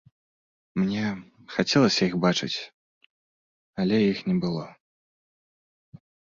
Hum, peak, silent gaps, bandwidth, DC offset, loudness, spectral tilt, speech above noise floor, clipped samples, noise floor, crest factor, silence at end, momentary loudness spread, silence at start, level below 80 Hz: none; -6 dBFS; 2.73-3.73 s; 7.6 kHz; under 0.1%; -25 LUFS; -5.5 dB/octave; over 66 dB; under 0.1%; under -90 dBFS; 22 dB; 1.6 s; 16 LU; 0.75 s; -62 dBFS